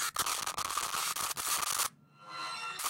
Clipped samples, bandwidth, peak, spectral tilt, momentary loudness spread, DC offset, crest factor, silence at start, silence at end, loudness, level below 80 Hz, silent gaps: under 0.1%; 17 kHz; -18 dBFS; 1 dB/octave; 8 LU; under 0.1%; 18 dB; 0 s; 0 s; -33 LUFS; -68 dBFS; none